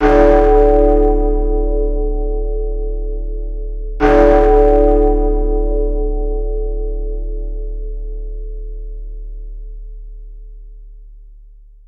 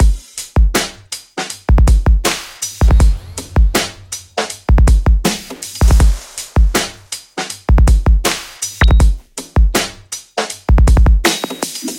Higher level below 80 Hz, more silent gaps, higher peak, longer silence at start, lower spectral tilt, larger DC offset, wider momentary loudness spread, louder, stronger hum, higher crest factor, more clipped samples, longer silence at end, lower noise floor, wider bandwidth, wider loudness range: about the same, -18 dBFS vs -14 dBFS; neither; about the same, 0 dBFS vs 0 dBFS; about the same, 0 s vs 0 s; first, -9 dB/octave vs -4.5 dB/octave; neither; first, 22 LU vs 12 LU; about the same, -15 LUFS vs -15 LUFS; neither; about the same, 14 dB vs 12 dB; neither; first, 0.5 s vs 0 s; first, -40 dBFS vs -31 dBFS; second, 4.4 kHz vs 16.5 kHz; first, 18 LU vs 1 LU